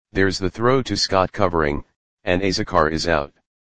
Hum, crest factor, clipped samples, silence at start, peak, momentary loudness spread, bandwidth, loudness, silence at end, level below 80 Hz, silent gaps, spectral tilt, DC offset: none; 20 dB; under 0.1%; 0 s; 0 dBFS; 5 LU; 9.8 kHz; -20 LUFS; 0.3 s; -40 dBFS; 1.96-2.17 s; -5 dB/octave; 1%